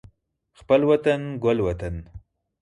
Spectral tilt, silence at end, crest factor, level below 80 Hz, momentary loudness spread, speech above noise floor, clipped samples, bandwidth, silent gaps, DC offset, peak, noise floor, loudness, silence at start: -7.5 dB/octave; 0.45 s; 18 dB; -44 dBFS; 14 LU; 42 dB; under 0.1%; 10.5 kHz; none; under 0.1%; -6 dBFS; -63 dBFS; -22 LUFS; 0.7 s